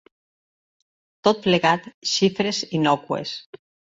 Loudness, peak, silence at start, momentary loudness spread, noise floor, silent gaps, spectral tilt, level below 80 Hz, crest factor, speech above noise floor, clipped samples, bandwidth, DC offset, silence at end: -21 LUFS; -2 dBFS; 1.25 s; 9 LU; under -90 dBFS; 1.94-2.01 s, 3.46-3.53 s; -4.5 dB/octave; -62 dBFS; 22 dB; over 68 dB; under 0.1%; 8 kHz; under 0.1%; 0.4 s